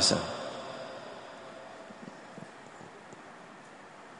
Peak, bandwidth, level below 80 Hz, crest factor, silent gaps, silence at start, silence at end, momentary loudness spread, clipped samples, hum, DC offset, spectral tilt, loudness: -12 dBFS; 10.5 kHz; -70 dBFS; 26 dB; none; 0 s; 0 s; 13 LU; under 0.1%; none; under 0.1%; -2.5 dB/octave; -39 LUFS